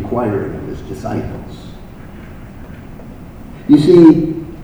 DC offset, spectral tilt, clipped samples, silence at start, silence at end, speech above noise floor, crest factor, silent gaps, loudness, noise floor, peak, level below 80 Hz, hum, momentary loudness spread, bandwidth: under 0.1%; -8.5 dB/octave; 0.5%; 0 s; 0 s; 21 dB; 14 dB; none; -12 LUFS; -33 dBFS; 0 dBFS; -36 dBFS; none; 27 LU; 9.6 kHz